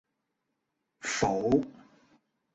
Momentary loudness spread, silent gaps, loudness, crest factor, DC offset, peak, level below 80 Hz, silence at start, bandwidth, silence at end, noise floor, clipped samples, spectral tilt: 13 LU; none; -29 LUFS; 22 dB; under 0.1%; -12 dBFS; -58 dBFS; 1.05 s; 8.4 kHz; 0.8 s; -82 dBFS; under 0.1%; -4.5 dB/octave